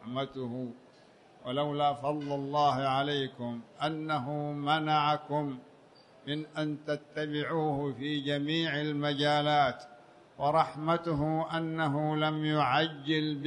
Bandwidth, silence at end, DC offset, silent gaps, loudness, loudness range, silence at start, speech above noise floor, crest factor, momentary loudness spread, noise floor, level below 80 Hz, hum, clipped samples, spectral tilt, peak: 10 kHz; 0 s; under 0.1%; none; -31 LUFS; 3 LU; 0 s; 28 dB; 20 dB; 10 LU; -59 dBFS; -66 dBFS; none; under 0.1%; -6.5 dB/octave; -12 dBFS